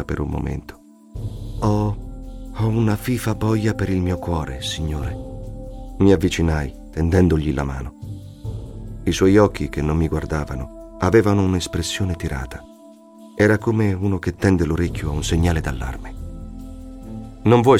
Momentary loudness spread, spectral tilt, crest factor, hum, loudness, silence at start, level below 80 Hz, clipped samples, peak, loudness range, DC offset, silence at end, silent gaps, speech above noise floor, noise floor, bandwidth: 19 LU; -6.5 dB/octave; 20 dB; none; -21 LUFS; 0 s; -32 dBFS; under 0.1%; -2 dBFS; 3 LU; under 0.1%; 0 s; none; 26 dB; -45 dBFS; 16 kHz